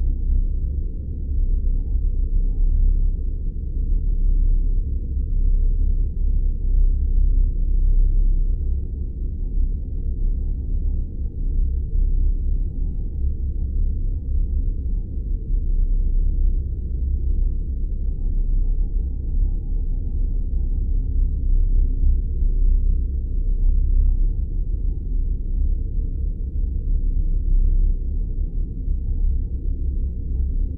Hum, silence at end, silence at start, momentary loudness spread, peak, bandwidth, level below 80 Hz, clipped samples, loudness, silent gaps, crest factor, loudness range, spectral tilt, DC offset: none; 0 s; 0 s; 5 LU; -8 dBFS; 0.6 kHz; -20 dBFS; under 0.1%; -26 LUFS; none; 12 dB; 3 LU; -14 dB/octave; under 0.1%